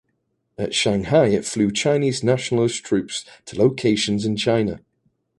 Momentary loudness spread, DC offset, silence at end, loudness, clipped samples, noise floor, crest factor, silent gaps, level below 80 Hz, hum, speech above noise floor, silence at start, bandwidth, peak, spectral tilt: 11 LU; under 0.1%; 0.65 s; -20 LUFS; under 0.1%; -72 dBFS; 18 dB; none; -52 dBFS; none; 52 dB; 0.6 s; 11.5 kHz; -2 dBFS; -5 dB/octave